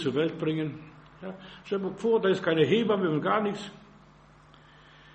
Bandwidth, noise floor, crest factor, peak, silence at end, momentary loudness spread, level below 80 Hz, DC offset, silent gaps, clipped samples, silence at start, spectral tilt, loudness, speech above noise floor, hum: 8.4 kHz; -55 dBFS; 18 dB; -10 dBFS; 1.3 s; 19 LU; -64 dBFS; under 0.1%; none; under 0.1%; 0 s; -7 dB/octave; -27 LUFS; 28 dB; none